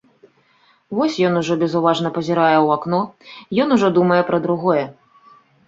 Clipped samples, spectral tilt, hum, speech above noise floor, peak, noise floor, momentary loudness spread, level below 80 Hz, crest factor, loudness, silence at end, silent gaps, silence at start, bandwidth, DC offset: under 0.1%; -6.5 dB/octave; none; 40 dB; -2 dBFS; -57 dBFS; 7 LU; -62 dBFS; 18 dB; -18 LUFS; 0.75 s; none; 0.9 s; 7.8 kHz; under 0.1%